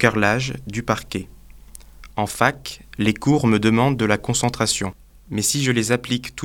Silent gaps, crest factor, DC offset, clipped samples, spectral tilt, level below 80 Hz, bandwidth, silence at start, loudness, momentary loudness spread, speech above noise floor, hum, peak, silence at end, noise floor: none; 22 dB; under 0.1%; under 0.1%; -4.5 dB/octave; -44 dBFS; 18 kHz; 0 s; -20 LUFS; 14 LU; 22 dB; none; 0 dBFS; 0 s; -42 dBFS